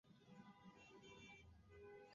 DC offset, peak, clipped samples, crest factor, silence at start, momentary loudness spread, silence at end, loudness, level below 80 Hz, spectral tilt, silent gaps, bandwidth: under 0.1%; -52 dBFS; under 0.1%; 14 dB; 0.05 s; 4 LU; 0 s; -64 LUFS; -78 dBFS; -4 dB/octave; none; 7.2 kHz